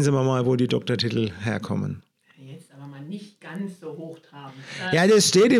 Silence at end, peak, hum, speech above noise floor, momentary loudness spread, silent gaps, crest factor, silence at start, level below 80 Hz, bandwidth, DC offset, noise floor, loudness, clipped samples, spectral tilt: 0 s; -6 dBFS; none; 23 dB; 25 LU; none; 18 dB; 0 s; -66 dBFS; 15.5 kHz; under 0.1%; -45 dBFS; -22 LUFS; under 0.1%; -5 dB/octave